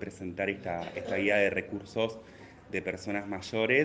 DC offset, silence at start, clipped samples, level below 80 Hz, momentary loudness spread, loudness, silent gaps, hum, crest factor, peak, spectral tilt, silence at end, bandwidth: under 0.1%; 0 s; under 0.1%; -66 dBFS; 12 LU; -32 LUFS; none; none; 20 dB; -12 dBFS; -5.5 dB/octave; 0 s; 9.4 kHz